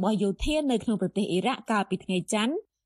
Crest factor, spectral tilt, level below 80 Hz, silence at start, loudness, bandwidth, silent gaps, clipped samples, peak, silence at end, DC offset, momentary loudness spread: 14 dB; -5 dB/octave; -44 dBFS; 0 s; -27 LUFS; 14 kHz; none; under 0.1%; -12 dBFS; 0.25 s; under 0.1%; 3 LU